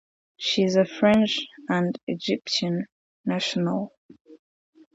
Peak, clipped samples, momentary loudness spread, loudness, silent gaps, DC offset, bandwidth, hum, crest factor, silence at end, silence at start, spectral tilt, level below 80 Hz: -8 dBFS; under 0.1%; 11 LU; -24 LUFS; 2.03-2.07 s, 2.92-3.24 s, 3.97-4.09 s, 4.21-4.25 s; under 0.1%; 8 kHz; none; 18 dB; 0.6 s; 0.4 s; -5 dB/octave; -66 dBFS